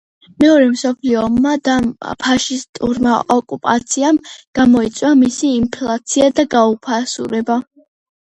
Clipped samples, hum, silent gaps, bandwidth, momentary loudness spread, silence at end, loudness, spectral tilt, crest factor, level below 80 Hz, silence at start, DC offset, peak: under 0.1%; none; 2.69-2.73 s, 4.47-4.53 s; 9.4 kHz; 8 LU; 0.65 s; -15 LUFS; -4 dB/octave; 14 dB; -46 dBFS; 0.4 s; under 0.1%; 0 dBFS